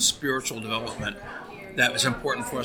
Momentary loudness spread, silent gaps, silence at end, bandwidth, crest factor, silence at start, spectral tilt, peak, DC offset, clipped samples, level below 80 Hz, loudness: 16 LU; none; 0 s; over 20 kHz; 22 dB; 0 s; -2 dB/octave; -6 dBFS; under 0.1%; under 0.1%; -52 dBFS; -26 LUFS